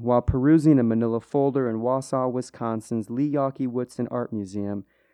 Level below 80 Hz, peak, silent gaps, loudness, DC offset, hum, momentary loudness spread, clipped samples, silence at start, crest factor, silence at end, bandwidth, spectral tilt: -44 dBFS; -8 dBFS; none; -24 LUFS; under 0.1%; none; 11 LU; under 0.1%; 0 s; 16 dB; 0.3 s; 11 kHz; -8.5 dB/octave